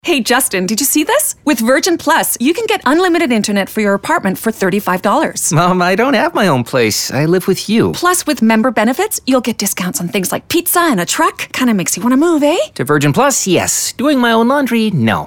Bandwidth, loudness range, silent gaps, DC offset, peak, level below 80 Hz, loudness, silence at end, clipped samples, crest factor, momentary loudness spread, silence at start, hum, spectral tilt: 20 kHz; 1 LU; none; under 0.1%; 0 dBFS; -50 dBFS; -13 LUFS; 0 s; under 0.1%; 12 dB; 4 LU; 0.05 s; none; -4 dB/octave